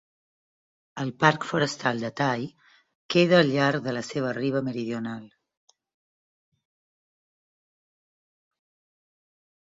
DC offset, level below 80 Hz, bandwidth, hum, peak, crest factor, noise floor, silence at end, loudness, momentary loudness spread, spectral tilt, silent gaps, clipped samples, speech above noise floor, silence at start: under 0.1%; -68 dBFS; 7.8 kHz; none; -4 dBFS; 24 dB; under -90 dBFS; 4.45 s; -25 LUFS; 14 LU; -5.5 dB/octave; 2.95-3.09 s; under 0.1%; over 65 dB; 0.95 s